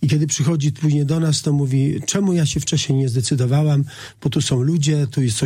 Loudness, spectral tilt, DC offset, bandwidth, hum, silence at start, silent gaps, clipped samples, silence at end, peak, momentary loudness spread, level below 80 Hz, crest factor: -19 LUFS; -5.5 dB/octave; under 0.1%; 15 kHz; none; 0 s; none; under 0.1%; 0 s; -6 dBFS; 2 LU; -48 dBFS; 12 dB